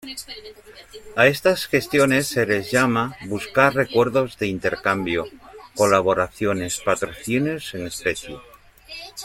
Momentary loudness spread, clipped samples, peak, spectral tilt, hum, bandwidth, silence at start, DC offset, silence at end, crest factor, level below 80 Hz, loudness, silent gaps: 18 LU; under 0.1%; -2 dBFS; -4.5 dB/octave; none; 16.5 kHz; 0.05 s; under 0.1%; 0 s; 20 dB; -52 dBFS; -21 LUFS; none